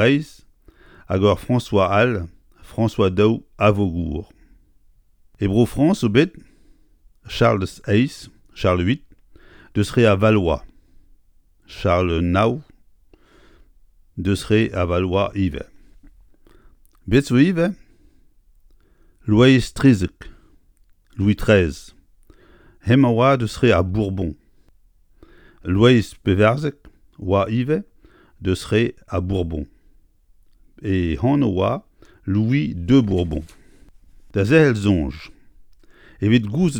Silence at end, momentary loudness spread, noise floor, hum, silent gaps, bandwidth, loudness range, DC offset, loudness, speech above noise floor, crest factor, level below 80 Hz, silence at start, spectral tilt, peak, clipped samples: 0 s; 15 LU; -55 dBFS; none; none; 17.5 kHz; 4 LU; under 0.1%; -19 LUFS; 37 dB; 20 dB; -40 dBFS; 0 s; -7 dB/octave; 0 dBFS; under 0.1%